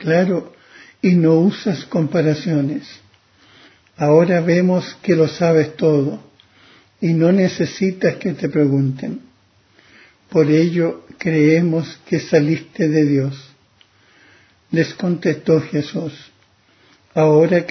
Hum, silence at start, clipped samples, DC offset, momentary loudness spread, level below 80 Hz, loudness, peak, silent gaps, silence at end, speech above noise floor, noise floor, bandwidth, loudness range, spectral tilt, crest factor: none; 0 s; under 0.1%; under 0.1%; 10 LU; -60 dBFS; -17 LUFS; 0 dBFS; none; 0 s; 39 dB; -55 dBFS; 6.4 kHz; 4 LU; -7.5 dB/octave; 16 dB